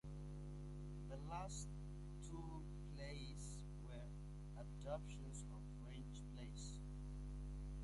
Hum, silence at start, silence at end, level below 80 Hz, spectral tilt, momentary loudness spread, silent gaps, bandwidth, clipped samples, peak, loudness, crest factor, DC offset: 50 Hz at -55 dBFS; 0.05 s; 0 s; -54 dBFS; -5.5 dB/octave; 4 LU; none; 11.5 kHz; under 0.1%; -34 dBFS; -53 LUFS; 16 dB; under 0.1%